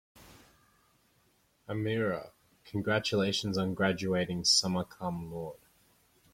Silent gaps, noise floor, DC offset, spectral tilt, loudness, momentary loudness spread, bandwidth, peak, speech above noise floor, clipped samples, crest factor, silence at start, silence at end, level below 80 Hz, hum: none; -70 dBFS; under 0.1%; -4 dB/octave; -31 LUFS; 15 LU; 16.5 kHz; -12 dBFS; 39 dB; under 0.1%; 22 dB; 0.15 s; 0.75 s; -64 dBFS; none